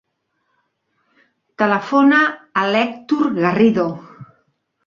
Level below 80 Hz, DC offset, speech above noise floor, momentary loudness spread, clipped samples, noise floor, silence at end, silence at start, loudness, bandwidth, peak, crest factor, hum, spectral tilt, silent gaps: -62 dBFS; under 0.1%; 54 dB; 8 LU; under 0.1%; -70 dBFS; 0.6 s; 1.6 s; -16 LUFS; 7.2 kHz; -2 dBFS; 16 dB; none; -6.5 dB/octave; none